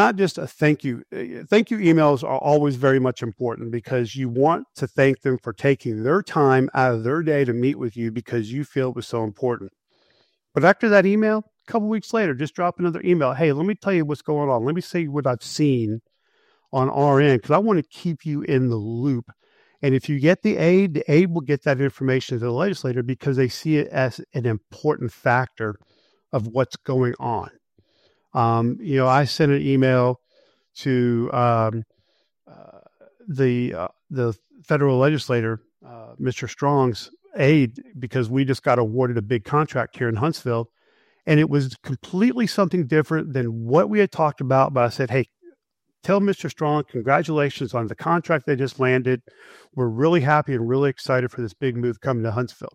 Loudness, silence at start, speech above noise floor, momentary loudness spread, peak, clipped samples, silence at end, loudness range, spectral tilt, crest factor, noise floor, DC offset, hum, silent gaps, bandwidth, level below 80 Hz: -21 LUFS; 0 s; 52 dB; 10 LU; 0 dBFS; under 0.1%; 0.05 s; 4 LU; -7.5 dB/octave; 20 dB; -73 dBFS; under 0.1%; none; none; 13.5 kHz; -62 dBFS